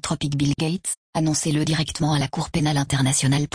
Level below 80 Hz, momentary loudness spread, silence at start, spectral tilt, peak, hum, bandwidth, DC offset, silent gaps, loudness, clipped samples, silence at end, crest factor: -46 dBFS; 5 LU; 0 s; -4.5 dB/octave; -8 dBFS; none; 10.5 kHz; under 0.1%; 0.97-1.13 s; -22 LUFS; under 0.1%; 0.1 s; 14 dB